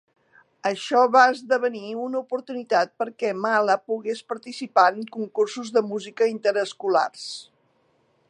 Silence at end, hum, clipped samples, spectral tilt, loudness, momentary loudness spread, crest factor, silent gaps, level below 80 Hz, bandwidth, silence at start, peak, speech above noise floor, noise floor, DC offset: 0.85 s; none; under 0.1%; -3.5 dB/octave; -23 LUFS; 13 LU; 22 dB; none; -84 dBFS; 11 kHz; 0.65 s; -2 dBFS; 42 dB; -65 dBFS; under 0.1%